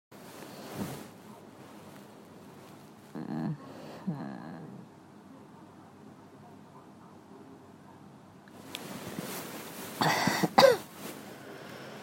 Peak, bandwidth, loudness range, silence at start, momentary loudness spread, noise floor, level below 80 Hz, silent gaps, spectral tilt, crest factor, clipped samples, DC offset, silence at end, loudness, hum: -4 dBFS; 16.5 kHz; 23 LU; 0.1 s; 25 LU; -53 dBFS; -72 dBFS; none; -4 dB/octave; 32 dB; under 0.1%; under 0.1%; 0 s; -31 LUFS; none